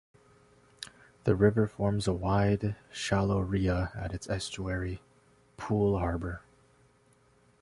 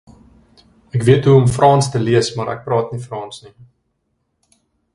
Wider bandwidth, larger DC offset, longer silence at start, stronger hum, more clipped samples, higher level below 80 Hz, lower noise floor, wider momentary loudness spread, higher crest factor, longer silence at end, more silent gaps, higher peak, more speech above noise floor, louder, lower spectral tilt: about the same, 11.5 kHz vs 11.5 kHz; neither; second, 0.8 s vs 0.95 s; neither; neither; about the same, -46 dBFS vs -48 dBFS; second, -65 dBFS vs -69 dBFS; about the same, 18 LU vs 18 LU; about the same, 20 dB vs 18 dB; second, 1.25 s vs 1.5 s; neither; second, -10 dBFS vs 0 dBFS; second, 36 dB vs 54 dB; second, -30 LUFS vs -15 LUFS; about the same, -6.5 dB/octave vs -6.5 dB/octave